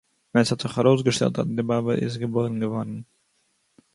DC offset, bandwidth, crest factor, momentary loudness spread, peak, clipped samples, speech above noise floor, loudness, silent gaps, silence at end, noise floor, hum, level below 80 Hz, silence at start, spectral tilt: under 0.1%; 11.5 kHz; 18 dB; 8 LU; -6 dBFS; under 0.1%; 46 dB; -24 LUFS; none; 0.9 s; -69 dBFS; none; -60 dBFS; 0.35 s; -6 dB/octave